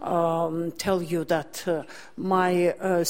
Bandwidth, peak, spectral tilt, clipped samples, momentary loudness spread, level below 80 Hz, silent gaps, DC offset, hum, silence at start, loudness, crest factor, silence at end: 16.5 kHz; -10 dBFS; -5.5 dB/octave; under 0.1%; 7 LU; -60 dBFS; none; 0.4%; none; 0 s; -26 LUFS; 16 dB; 0 s